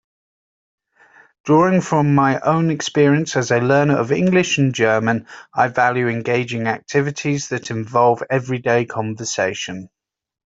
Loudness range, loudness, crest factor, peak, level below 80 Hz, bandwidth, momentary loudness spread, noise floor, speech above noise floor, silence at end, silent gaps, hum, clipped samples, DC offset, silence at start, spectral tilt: 4 LU; -18 LUFS; 16 dB; -2 dBFS; -58 dBFS; 8 kHz; 9 LU; -51 dBFS; 34 dB; 0.7 s; none; none; under 0.1%; under 0.1%; 1.45 s; -5.5 dB/octave